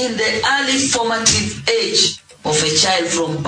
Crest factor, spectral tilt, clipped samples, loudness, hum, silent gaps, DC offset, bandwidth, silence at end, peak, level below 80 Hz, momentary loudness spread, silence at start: 16 dB; -2 dB/octave; under 0.1%; -15 LUFS; none; none; under 0.1%; 10.5 kHz; 0 s; 0 dBFS; -48 dBFS; 5 LU; 0 s